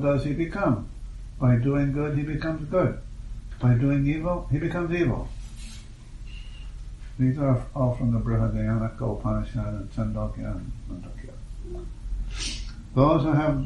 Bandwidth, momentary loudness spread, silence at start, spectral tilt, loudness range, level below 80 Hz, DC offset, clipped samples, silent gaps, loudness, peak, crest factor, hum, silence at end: 10.5 kHz; 20 LU; 0 s; -8 dB/octave; 7 LU; -36 dBFS; under 0.1%; under 0.1%; none; -26 LUFS; -8 dBFS; 18 dB; none; 0 s